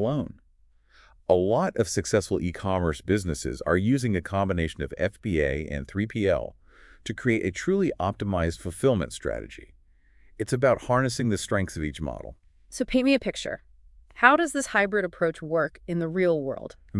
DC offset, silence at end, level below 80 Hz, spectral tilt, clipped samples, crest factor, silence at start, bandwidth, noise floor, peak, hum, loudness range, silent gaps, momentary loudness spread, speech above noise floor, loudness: under 0.1%; 0 s; -46 dBFS; -5.5 dB/octave; under 0.1%; 26 dB; 0 s; 12 kHz; -60 dBFS; -2 dBFS; none; 3 LU; none; 12 LU; 35 dB; -26 LUFS